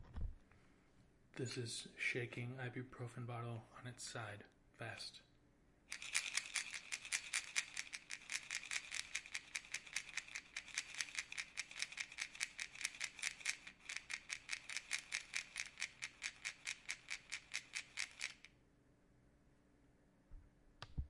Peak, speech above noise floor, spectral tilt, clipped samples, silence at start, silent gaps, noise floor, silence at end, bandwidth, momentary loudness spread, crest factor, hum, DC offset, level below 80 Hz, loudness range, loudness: -18 dBFS; 24 dB; -1.5 dB/octave; under 0.1%; 0 s; none; -72 dBFS; 0 s; 11.5 kHz; 10 LU; 30 dB; none; under 0.1%; -64 dBFS; 7 LU; -46 LUFS